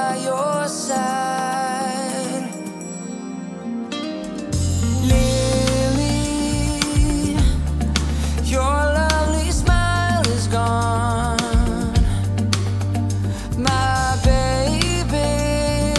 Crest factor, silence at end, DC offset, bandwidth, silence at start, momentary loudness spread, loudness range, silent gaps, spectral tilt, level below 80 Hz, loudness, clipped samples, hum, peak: 18 dB; 0 s; under 0.1%; 12 kHz; 0 s; 9 LU; 5 LU; none; -5 dB/octave; -26 dBFS; -20 LUFS; under 0.1%; none; 0 dBFS